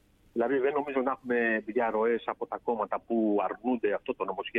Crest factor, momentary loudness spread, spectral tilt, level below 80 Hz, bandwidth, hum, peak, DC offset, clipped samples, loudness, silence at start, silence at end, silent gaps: 16 dB; 6 LU; -8 dB/octave; -68 dBFS; 3.9 kHz; none; -14 dBFS; under 0.1%; under 0.1%; -30 LUFS; 0.35 s; 0 s; none